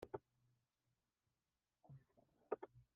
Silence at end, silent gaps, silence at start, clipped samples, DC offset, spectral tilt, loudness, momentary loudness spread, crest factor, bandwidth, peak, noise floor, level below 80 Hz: 0.15 s; none; 0 s; under 0.1%; under 0.1%; -4 dB/octave; -53 LUFS; 15 LU; 30 dB; 3.5 kHz; -28 dBFS; under -90 dBFS; -84 dBFS